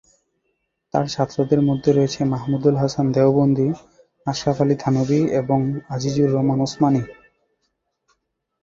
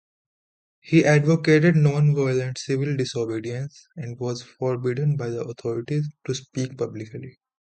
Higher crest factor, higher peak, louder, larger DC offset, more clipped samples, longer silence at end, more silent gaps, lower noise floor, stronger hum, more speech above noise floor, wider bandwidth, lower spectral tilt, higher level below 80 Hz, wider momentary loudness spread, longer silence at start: about the same, 18 dB vs 18 dB; about the same, -4 dBFS vs -4 dBFS; first, -20 LUFS vs -23 LUFS; neither; neither; first, 1.5 s vs 0.45 s; neither; second, -73 dBFS vs under -90 dBFS; neither; second, 54 dB vs over 68 dB; second, 7.6 kHz vs 9 kHz; about the same, -7.5 dB/octave vs -7 dB/octave; first, -52 dBFS vs -62 dBFS; second, 7 LU vs 15 LU; about the same, 0.95 s vs 0.85 s